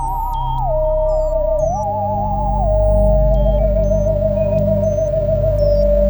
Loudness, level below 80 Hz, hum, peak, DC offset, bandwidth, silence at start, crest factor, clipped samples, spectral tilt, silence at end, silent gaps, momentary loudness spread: -17 LUFS; -20 dBFS; none; -4 dBFS; under 0.1%; over 20 kHz; 0 s; 12 dB; under 0.1%; -9 dB/octave; 0 s; none; 5 LU